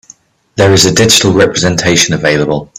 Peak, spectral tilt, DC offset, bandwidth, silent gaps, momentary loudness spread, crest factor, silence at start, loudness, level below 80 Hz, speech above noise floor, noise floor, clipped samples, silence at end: 0 dBFS; -3.5 dB/octave; under 0.1%; over 20 kHz; none; 5 LU; 10 dB; 0.55 s; -8 LUFS; -38 dBFS; 33 dB; -42 dBFS; 0.2%; 0.15 s